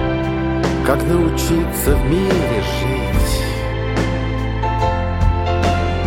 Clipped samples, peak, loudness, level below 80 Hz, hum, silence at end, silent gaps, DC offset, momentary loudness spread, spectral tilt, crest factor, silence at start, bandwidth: under 0.1%; -2 dBFS; -18 LUFS; -22 dBFS; none; 0 s; none; under 0.1%; 4 LU; -6 dB/octave; 16 dB; 0 s; 17 kHz